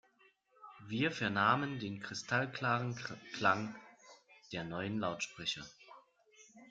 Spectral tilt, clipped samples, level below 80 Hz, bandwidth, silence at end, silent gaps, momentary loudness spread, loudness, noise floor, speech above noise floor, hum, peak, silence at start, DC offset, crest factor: -4.5 dB/octave; under 0.1%; -74 dBFS; 9 kHz; 0.05 s; none; 14 LU; -36 LUFS; -70 dBFS; 34 dB; none; -14 dBFS; 0.6 s; under 0.1%; 24 dB